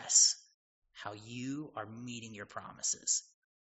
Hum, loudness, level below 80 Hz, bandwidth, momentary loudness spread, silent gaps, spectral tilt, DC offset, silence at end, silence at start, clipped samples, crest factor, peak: none; -32 LUFS; -78 dBFS; 8 kHz; 20 LU; 0.54-0.82 s; -2 dB/octave; under 0.1%; 0.5 s; 0 s; under 0.1%; 24 dB; -12 dBFS